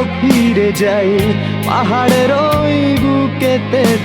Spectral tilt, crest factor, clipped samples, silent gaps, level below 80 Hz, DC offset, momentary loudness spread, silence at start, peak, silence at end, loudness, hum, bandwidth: -6 dB/octave; 12 dB; under 0.1%; none; -38 dBFS; under 0.1%; 4 LU; 0 s; 0 dBFS; 0 s; -13 LUFS; none; over 20 kHz